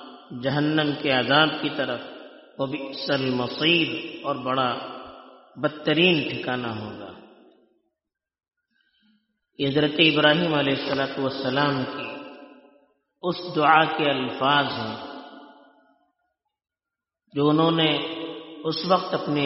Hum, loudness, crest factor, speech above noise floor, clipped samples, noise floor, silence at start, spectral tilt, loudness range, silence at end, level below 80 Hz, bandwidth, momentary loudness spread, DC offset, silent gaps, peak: none; -23 LUFS; 22 dB; 65 dB; under 0.1%; -88 dBFS; 0 s; -2.5 dB/octave; 6 LU; 0 s; -66 dBFS; 6 kHz; 18 LU; under 0.1%; none; -2 dBFS